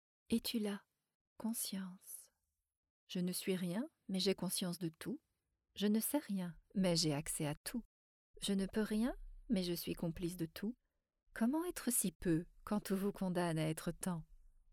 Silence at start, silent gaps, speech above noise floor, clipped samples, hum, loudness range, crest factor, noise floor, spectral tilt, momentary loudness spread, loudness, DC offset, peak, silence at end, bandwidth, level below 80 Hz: 0.3 s; 1.15-1.36 s, 2.77-2.83 s, 2.90-3.07 s, 7.57-7.64 s, 7.85-8.34 s, 12.15-12.20 s; 47 dB; under 0.1%; none; 5 LU; 18 dB; -86 dBFS; -4.5 dB/octave; 12 LU; -40 LUFS; under 0.1%; -22 dBFS; 0.25 s; 19.5 kHz; -62 dBFS